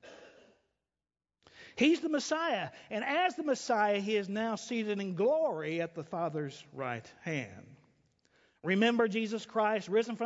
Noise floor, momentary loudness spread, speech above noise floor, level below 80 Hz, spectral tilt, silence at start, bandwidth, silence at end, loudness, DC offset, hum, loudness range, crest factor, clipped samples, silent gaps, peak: under -90 dBFS; 11 LU; over 58 dB; -78 dBFS; -5 dB/octave; 0 s; 8 kHz; 0 s; -32 LUFS; under 0.1%; none; 4 LU; 20 dB; under 0.1%; none; -14 dBFS